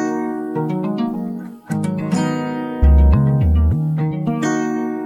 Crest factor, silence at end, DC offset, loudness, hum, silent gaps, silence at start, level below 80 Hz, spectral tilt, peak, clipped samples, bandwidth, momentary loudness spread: 14 dB; 0 s; under 0.1%; -18 LUFS; none; none; 0 s; -20 dBFS; -8 dB/octave; -2 dBFS; under 0.1%; 10 kHz; 10 LU